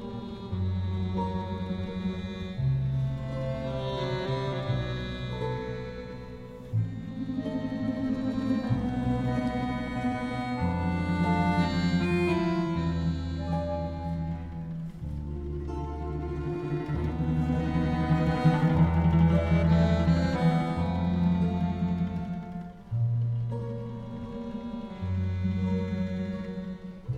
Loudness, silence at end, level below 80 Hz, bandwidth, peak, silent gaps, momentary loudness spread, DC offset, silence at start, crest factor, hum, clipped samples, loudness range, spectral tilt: -29 LUFS; 0 s; -40 dBFS; 8.6 kHz; -10 dBFS; none; 13 LU; under 0.1%; 0 s; 18 dB; none; under 0.1%; 9 LU; -8.5 dB/octave